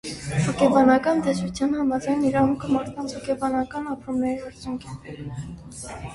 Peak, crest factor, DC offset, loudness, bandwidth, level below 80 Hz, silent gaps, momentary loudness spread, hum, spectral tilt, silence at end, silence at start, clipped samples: -4 dBFS; 20 dB; under 0.1%; -23 LUFS; 11.5 kHz; -48 dBFS; none; 18 LU; none; -6 dB/octave; 0 s; 0.05 s; under 0.1%